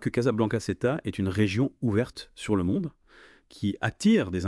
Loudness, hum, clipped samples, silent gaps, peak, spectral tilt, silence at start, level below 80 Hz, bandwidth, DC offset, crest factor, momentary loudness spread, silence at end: -27 LUFS; none; under 0.1%; none; -10 dBFS; -6.5 dB/octave; 0 s; -58 dBFS; 12 kHz; under 0.1%; 16 dB; 9 LU; 0 s